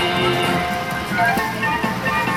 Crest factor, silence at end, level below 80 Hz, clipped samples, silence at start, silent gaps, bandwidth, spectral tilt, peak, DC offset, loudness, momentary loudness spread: 14 dB; 0 s; -44 dBFS; under 0.1%; 0 s; none; 17 kHz; -4.5 dB/octave; -6 dBFS; under 0.1%; -19 LUFS; 4 LU